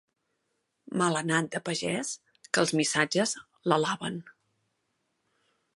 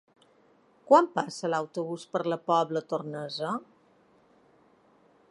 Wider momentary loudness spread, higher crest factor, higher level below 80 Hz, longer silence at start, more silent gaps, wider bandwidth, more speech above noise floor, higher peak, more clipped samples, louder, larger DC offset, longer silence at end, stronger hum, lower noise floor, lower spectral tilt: about the same, 11 LU vs 12 LU; about the same, 22 dB vs 24 dB; first, -74 dBFS vs -82 dBFS; about the same, 0.9 s vs 0.9 s; neither; about the same, 11.5 kHz vs 11.5 kHz; first, 50 dB vs 35 dB; about the same, -8 dBFS vs -6 dBFS; neither; about the same, -28 LUFS vs -28 LUFS; neither; second, 1.45 s vs 1.65 s; neither; first, -79 dBFS vs -63 dBFS; second, -3.5 dB/octave vs -5.5 dB/octave